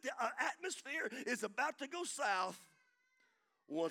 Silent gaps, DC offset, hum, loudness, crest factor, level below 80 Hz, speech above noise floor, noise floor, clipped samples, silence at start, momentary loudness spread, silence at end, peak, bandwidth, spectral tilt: none; under 0.1%; none; -40 LUFS; 20 dB; under -90 dBFS; 38 dB; -78 dBFS; under 0.1%; 0.05 s; 7 LU; 0 s; -22 dBFS; 19 kHz; -2 dB/octave